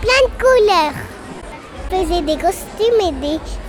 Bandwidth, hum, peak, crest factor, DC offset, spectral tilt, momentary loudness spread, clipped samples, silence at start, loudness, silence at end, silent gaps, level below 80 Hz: 19 kHz; none; 0 dBFS; 16 dB; under 0.1%; -4 dB/octave; 20 LU; under 0.1%; 0 s; -16 LUFS; 0 s; none; -30 dBFS